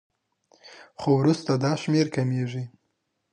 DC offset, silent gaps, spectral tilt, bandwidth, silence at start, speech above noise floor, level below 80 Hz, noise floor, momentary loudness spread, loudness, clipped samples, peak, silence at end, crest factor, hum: under 0.1%; none; -7 dB/octave; 10 kHz; 0.65 s; 53 dB; -68 dBFS; -76 dBFS; 14 LU; -25 LUFS; under 0.1%; -10 dBFS; 0.65 s; 16 dB; none